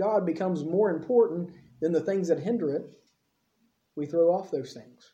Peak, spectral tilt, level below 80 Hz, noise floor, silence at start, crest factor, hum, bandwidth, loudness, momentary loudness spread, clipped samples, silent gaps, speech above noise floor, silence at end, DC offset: -12 dBFS; -8 dB/octave; -76 dBFS; -74 dBFS; 0 s; 16 dB; none; 8.2 kHz; -27 LUFS; 14 LU; under 0.1%; none; 47 dB; 0.3 s; under 0.1%